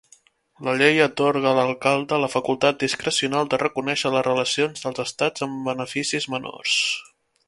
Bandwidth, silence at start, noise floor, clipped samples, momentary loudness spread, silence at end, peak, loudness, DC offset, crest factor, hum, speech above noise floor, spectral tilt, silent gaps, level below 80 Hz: 11.5 kHz; 0.6 s; -57 dBFS; under 0.1%; 8 LU; 0.45 s; -2 dBFS; -22 LUFS; under 0.1%; 22 dB; none; 35 dB; -3.5 dB/octave; none; -64 dBFS